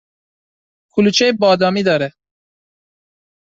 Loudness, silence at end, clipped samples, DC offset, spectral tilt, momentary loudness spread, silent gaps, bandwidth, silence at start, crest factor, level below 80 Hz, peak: -15 LUFS; 1.35 s; under 0.1%; under 0.1%; -4.5 dB/octave; 8 LU; none; 7.8 kHz; 0.95 s; 16 dB; -58 dBFS; -2 dBFS